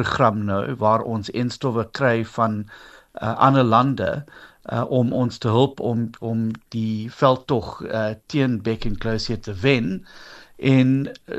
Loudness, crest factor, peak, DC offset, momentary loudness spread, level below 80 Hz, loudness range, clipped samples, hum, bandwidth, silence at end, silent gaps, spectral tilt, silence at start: -22 LUFS; 20 dB; -2 dBFS; under 0.1%; 10 LU; -44 dBFS; 3 LU; under 0.1%; none; 8.4 kHz; 0 s; none; -7.5 dB/octave; 0 s